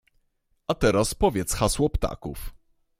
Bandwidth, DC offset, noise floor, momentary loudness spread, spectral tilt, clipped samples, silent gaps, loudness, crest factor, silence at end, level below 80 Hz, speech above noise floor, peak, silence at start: 16 kHz; under 0.1%; -70 dBFS; 16 LU; -4.5 dB/octave; under 0.1%; none; -24 LUFS; 18 dB; 0.45 s; -36 dBFS; 46 dB; -8 dBFS; 0.7 s